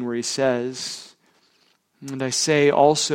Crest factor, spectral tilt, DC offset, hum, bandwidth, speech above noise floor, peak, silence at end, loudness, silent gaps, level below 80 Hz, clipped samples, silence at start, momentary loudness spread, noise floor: 18 dB; -3.5 dB/octave; under 0.1%; none; 16.5 kHz; 42 dB; -4 dBFS; 0 s; -21 LUFS; none; -64 dBFS; under 0.1%; 0 s; 19 LU; -63 dBFS